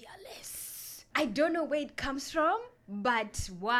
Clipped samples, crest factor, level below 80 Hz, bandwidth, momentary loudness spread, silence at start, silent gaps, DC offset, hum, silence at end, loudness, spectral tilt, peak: under 0.1%; 18 dB; -52 dBFS; 17.5 kHz; 13 LU; 0 s; none; under 0.1%; none; 0 s; -32 LUFS; -3.5 dB/octave; -16 dBFS